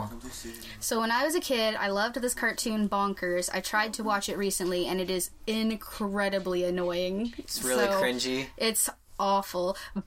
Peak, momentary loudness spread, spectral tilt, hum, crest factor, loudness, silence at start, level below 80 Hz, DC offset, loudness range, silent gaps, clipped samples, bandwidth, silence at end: -12 dBFS; 6 LU; -3 dB/octave; none; 16 dB; -29 LUFS; 0 s; -54 dBFS; under 0.1%; 2 LU; none; under 0.1%; 16.5 kHz; 0 s